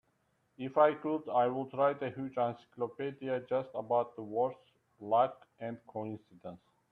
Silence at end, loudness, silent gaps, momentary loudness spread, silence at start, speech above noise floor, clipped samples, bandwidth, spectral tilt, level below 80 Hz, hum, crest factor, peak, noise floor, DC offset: 0.35 s; -34 LUFS; none; 16 LU; 0.6 s; 42 dB; under 0.1%; 4.3 kHz; -8.5 dB/octave; -80 dBFS; none; 22 dB; -14 dBFS; -76 dBFS; under 0.1%